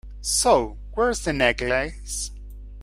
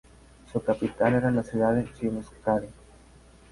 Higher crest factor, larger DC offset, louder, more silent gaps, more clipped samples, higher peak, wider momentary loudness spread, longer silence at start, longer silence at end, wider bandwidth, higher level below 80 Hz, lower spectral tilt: about the same, 20 dB vs 18 dB; neither; first, -23 LUFS vs -27 LUFS; neither; neither; first, -4 dBFS vs -10 dBFS; first, 14 LU vs 8 LU; second, 0.05 s vs 0.55 s; second, 0 s vs 0.8 s; first, 16 kHz vs 11.5 kHz; first, -36 dBFS vs -52 dBFS; second, -2.5 dB/octave vs -8 dB/octave